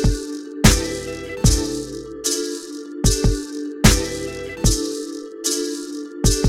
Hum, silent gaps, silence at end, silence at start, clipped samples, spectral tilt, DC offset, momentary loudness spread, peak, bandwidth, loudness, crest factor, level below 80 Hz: none; none; 0 s; 0 s; under 0.1%; -4 dB/octave; under 0.1%; 14 LU; 0 dBFS; 16.5 kHz; -21 LUFS; 20 dB; -26 dBFS